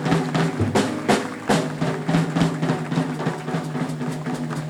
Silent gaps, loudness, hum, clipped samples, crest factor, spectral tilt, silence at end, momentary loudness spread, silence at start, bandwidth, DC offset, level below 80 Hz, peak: none; -23 LUFS; none; under 0.1%; 16 dB; -6 dB/octave; 0 s; 6 LU; 0 s; 14 kHz; under 0.1%; -50 dBFS; -6 dBFS